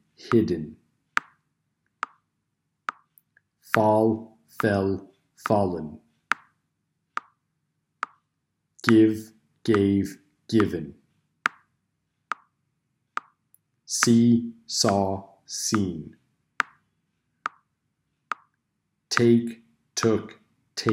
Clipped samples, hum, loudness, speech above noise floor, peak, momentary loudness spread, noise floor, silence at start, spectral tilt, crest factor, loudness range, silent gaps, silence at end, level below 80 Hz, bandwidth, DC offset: under 0.1%; none; -25 LUFS; 56 dB; -2 dBFS; 17 LU; -78 dBFS; 0.25 s; -5 dB/octave; 24 dB; 9 LU; none; 0 s; -64 dBFS; 16 kHz; under 0.1%